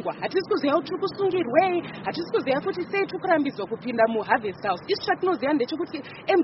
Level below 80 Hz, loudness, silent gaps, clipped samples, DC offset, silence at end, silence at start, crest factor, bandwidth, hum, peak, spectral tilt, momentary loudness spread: -66 dBFS; -25 LUFS; none; under 0.1%; under 0.1%; 0 s; 0 s; 18 dB; 6 kHz; none; -6 dBFS; -3 dB/octave; 8 LU